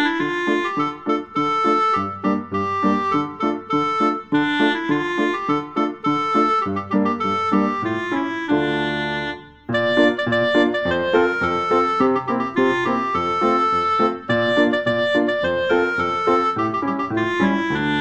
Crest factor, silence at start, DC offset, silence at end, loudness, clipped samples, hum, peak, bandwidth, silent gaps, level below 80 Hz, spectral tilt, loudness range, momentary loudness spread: 16 dB; 0 s; 0.2%; 0 s; -20 LUFS; under 0.1%; none; -4 dBFS; 8.4 kHz; none; -54 dBFS; -6 dB/octave; 2 LU; 5 LU